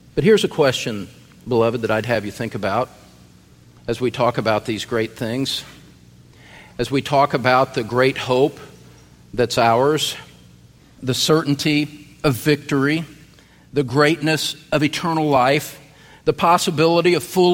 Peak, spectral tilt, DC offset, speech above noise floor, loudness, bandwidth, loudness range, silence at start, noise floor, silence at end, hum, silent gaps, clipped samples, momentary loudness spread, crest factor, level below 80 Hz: -2 dBFS; -5 dB/octave; under 0.1%; 30 dB; -19 LUFS; 16.5 kHz; 5 LU; 0.15 s; -48 dBFS; 0 s; none; none; under 0.1%; 12 LU; 18 dB; -50 dBFS